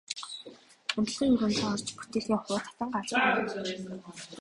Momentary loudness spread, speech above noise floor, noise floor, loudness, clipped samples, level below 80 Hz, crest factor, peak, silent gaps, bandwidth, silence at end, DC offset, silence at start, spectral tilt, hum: 16 LU; 21 dB; -51 dBFS; -30 LUFS; under 0.1%; -62 dBFS; 18 dB; -14 dBFS; none; 11.5 kHz; 0 s; under 0.1%; 0.1 s; -4 dB/octave; none